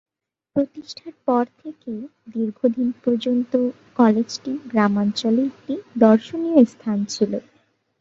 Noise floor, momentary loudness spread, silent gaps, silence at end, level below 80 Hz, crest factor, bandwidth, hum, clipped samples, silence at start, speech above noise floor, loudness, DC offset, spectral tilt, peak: -39 dBFS; 16 LU; none; 0.6 s; -66 dBFS; 18 dB; 7.8 kHz; none; under 0.1%; 0.55 s; 18 dB; -21 LUFS; under 0.1%; -6 dB/octave; -2 dBFS